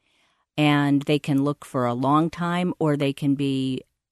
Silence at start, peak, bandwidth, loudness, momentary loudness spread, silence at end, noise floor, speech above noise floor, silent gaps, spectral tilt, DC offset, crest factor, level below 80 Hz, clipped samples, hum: 0.55 s; -8 dBFS; 13 kHz; -23 LUFS; 6 LU; 0.3 s; -67 dBFS; 44 dB; none; -7 dB/octave; under 0.1%; 16 dB; -62 dBFS; under 0.1%; none